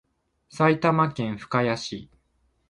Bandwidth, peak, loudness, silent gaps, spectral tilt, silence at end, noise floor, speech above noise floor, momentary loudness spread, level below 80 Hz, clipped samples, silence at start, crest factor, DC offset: 11 kHz; -6 dBFS; -24 LUFS; none; -6.5 dB/octave; 0.65 s; -68 dBFS; 45 dB; 12 LU; -60 dBFS; under 0.1%; 0.55 s; 20 dB; under 0.1%